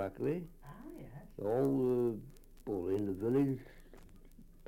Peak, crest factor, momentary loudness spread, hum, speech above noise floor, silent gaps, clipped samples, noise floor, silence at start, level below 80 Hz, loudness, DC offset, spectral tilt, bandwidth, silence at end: -20 dBFS; 16 dB; 19 LU; none; 22 dB; none; under 0.1%; -56 dBFS; 0 s; -58 dBFS; -35 LUFS; under 0.1%; -9.5 dB/octave; 16.5 kHz; 0 s